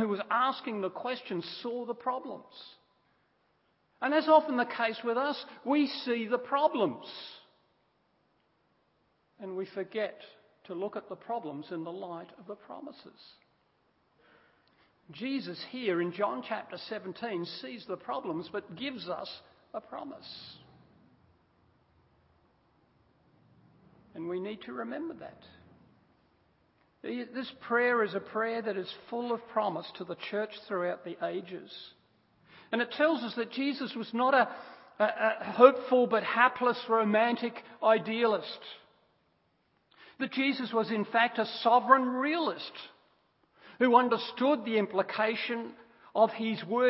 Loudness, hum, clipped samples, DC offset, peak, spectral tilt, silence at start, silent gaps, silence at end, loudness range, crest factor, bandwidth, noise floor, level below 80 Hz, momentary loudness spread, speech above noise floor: -31 LUFS; none; under 0.1%; under 0.1%; -4 dBFS; -2.5 dB/octave; 0 s; none; 0 s; 16 LU; 28 dB; 5.8 kHz; -73 dBFS; -80 dBFS; 19 LU; 42 dB